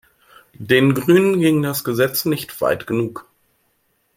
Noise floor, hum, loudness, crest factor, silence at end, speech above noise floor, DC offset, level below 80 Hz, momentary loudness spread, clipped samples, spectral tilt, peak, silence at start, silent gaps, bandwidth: -65 dBFS; none; -18 LUFS; 18 dB; 0.95 s; 48 dB; under 0.1%; -56 dBFS; 10 LU; under 0.1%; -5.5 dB/octave; -2 dBFS; 0.6 s; none; 16.5 kHz